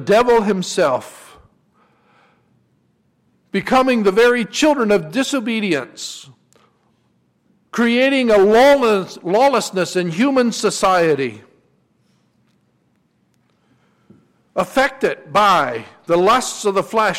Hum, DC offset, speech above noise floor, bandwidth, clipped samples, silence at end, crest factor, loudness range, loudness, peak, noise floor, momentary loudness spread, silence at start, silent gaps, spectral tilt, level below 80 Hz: none; under 0.1%; 46 dB; 16.5 kHz; under 0.1%; 0 s; 12 dB; 10 LU; -16 LUFS; -6 dBFS; -62 dBFS; 11 LU; 0 s; none; -4 dB/octave; -52 dBFS